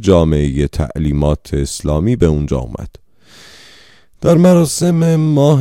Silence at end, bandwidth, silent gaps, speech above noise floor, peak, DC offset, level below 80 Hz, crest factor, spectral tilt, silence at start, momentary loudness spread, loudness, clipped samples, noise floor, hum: 0 s; 15.5 kHz; none; 33 dB; 0 dBFS; 0.4%; -26 dBFS; 14 dB; -7 dB/octave; 0 s; 10 LU; -14 LUFS; under 0.1%; -46 dBFS; none